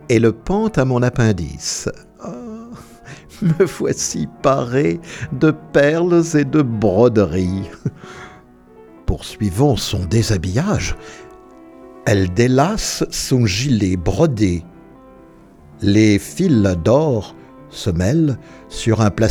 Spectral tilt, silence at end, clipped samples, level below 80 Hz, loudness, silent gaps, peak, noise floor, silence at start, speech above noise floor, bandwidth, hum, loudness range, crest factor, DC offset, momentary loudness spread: -6 dB/octave; 0 s; under 0.1%; -36 dBFS; -17 LUFS; none; -2 dBFS; -44 dBFS; 0.05 s; 28 dB; 17.5 kHz; none; 4 LU; 16 dB; under 0.1%; 18 LU